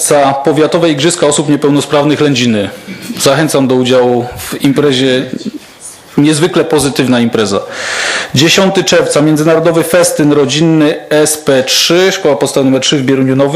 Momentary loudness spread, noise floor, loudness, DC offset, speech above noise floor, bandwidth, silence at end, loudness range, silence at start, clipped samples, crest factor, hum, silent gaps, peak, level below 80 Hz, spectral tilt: 7 LU; -32 dBFS; -9 LUFS; under 0.1%; 22 dB; 16 kHz; 0 s; 3 LU; 0 s; 0.2%; 10 dB; none; none; 0 dBFS; -46 dBFS; -4 dB/octave